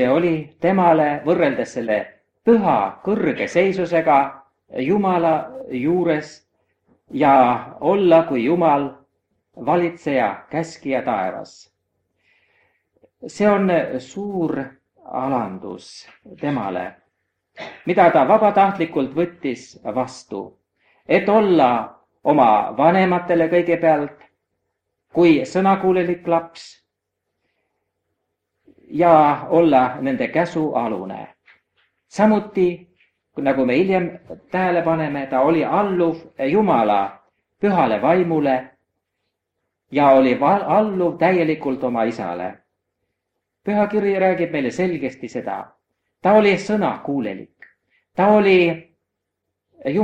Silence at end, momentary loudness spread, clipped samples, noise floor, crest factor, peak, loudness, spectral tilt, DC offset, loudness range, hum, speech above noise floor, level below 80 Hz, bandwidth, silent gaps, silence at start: 0 s; 15 LU; under 0.1%; -79 dBFS; 20 dB; 0 dBFS; -18 LUFS; -7 dB/octave; under 0.1%; 6 LU; none; 61 dB; -60 dBFS; 9.2 kHz; none; 0 s